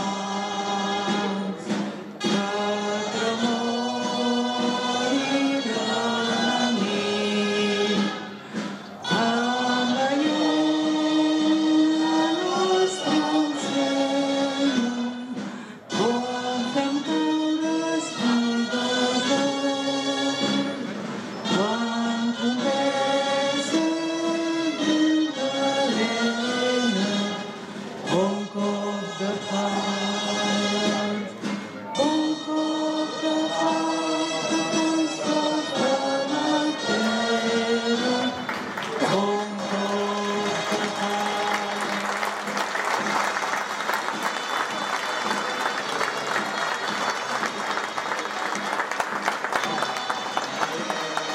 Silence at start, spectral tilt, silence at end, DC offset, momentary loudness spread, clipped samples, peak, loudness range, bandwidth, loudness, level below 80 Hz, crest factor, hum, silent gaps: 0 s; -3.5 dB/octave; 0 s; under 0.1%; 6 LU; under 0.1%; -10 dBFS; 4 LU; 15 kHz; -24 LUFS; -78 dBFS; 16 dB; none; none